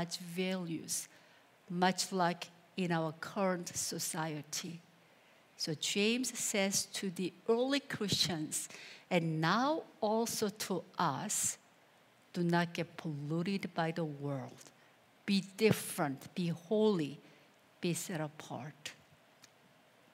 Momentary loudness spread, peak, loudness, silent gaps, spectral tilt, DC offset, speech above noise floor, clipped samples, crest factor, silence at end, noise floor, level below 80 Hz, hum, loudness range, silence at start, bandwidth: 13 LU; -14 dBFS; -36 LUFS; none; -4 dB/octave; under 0.1%; 30 dB; under 0.1%; 22 dB; 1.2 s; -66 dBFS; -82 dBFS; none; 4 LU; 0 s; 16 kHz